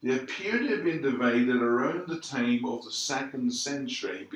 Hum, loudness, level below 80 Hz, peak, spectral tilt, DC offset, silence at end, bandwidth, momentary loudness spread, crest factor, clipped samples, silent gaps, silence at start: none; -28 LUFS; -80 dBFS; -12 dBFS; -4 dB/octave; under 0.1%; 0 s; 11.5 kHz; 7 LU; 16 dB; under 0.1%; none; 0 s